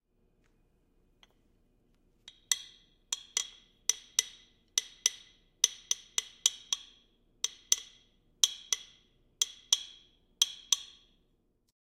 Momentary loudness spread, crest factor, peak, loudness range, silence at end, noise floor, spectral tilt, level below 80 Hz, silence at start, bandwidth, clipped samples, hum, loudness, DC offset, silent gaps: 10 LU; 34 dB; -4 dBFS; 6 LU; 1.15 s; -73 dBFS; 4 dB/octave; -72 dBFS; 2.5 s; 16 kHz; under 0.1%; none; -32 LUFS; under 0.1%; none